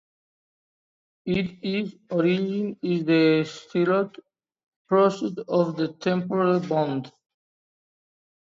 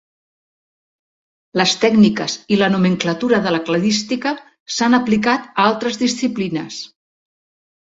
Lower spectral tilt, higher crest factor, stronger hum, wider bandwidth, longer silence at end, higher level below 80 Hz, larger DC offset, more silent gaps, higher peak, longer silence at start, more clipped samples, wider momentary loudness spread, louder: first, -7.5 dB/octave vs -4.5 dB/octave; about the same, 18 dB vs 16 dB; neither; about the same, 7.6 kHz vs 8 kHz; first, 1.4 s vs 1.1 s; second, -64 dBFS vs -58 dBFS; neither; first, 4.66-4.85 s vs 4.60-4.66 s; second, -8 dBFS vs -2 dBFS; second, 1.25 s vs 1.55 s; neither; about the same, 9 LU vs 11 LU; second, -24 LUFS vs -17 LUFS